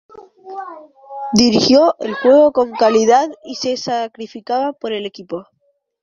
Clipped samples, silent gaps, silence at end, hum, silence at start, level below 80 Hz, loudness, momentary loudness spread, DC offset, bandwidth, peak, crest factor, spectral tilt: under 0.1%; none; 0.6 s; none; 0.15 s; -56 dBFS; -15 LUFS; 20 LU; under 0.1%; 11.5 kHz; 0 dBFS; 16 dB; -4 dB/octave